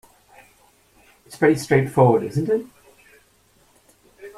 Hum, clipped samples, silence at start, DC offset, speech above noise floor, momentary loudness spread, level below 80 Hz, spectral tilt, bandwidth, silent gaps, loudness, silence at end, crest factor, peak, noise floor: none; under 0.1%; 1.3 s; under 0.1%; 40 dB; 8 LU; -56 dBFS; -7 dB/octave; 15 kHz; none; -19 LUFS; 0.1 s; 20 dB; -4 dBFS; -58 dBFS